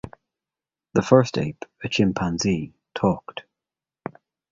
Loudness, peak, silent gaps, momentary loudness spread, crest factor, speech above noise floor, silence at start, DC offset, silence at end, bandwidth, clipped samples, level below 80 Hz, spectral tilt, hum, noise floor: -23 LUFS; -2 dBFS; none; 21 LU; 22 dB; over 68 dB; 0.05 s; under 0.1%; 1.1 s; 7.8 kHz; under 0.1%; -50 dBFS; -6 dB/octave; none; under -90 dBFS